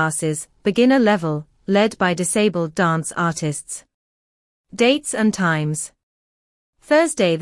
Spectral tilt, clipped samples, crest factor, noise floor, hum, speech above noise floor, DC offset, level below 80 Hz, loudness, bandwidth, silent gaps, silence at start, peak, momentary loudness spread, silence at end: -4.5 dB/octave; under 0.1%; 16 dB; under -90 dBFS; none; over 71 dB; under 0.1%; -60 dBFS; -19 LUFS; 12 kHz; 3.94-4.64 s, 6.03-6.73 s; 0 s; -4 dBFS; 12 LU; 0 s